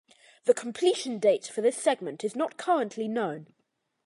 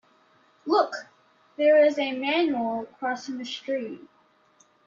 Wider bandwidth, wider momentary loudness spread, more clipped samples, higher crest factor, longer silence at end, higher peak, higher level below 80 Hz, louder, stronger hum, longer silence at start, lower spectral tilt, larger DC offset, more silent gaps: first, 11.5 kHz vs 7.4 kHz; second, 6 LU vs 19 LU; neither; about the same, 20 dB vs 18 dB; second, 0.6 s vs 0.9 s; about the same, -10 dBFS vs -10 dBFS; second, -84 dBFS vs -76 dBFS; second, -28 LUFS vs -25 LUFS; neither; second, 0.45 s vs 0.65 s; about the same, -4 dB/octave vs -4 dB/octave; neither; neither